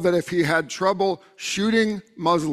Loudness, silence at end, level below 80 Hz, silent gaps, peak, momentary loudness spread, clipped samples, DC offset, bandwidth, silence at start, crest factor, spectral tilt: -23 LUFS; 0 s; -60 dBFS; none; -6 dBFS; 5 LU; under 0.1%; under 0.1%; 14 kHz; 0 s; 16 dB; -4.5 dB/octave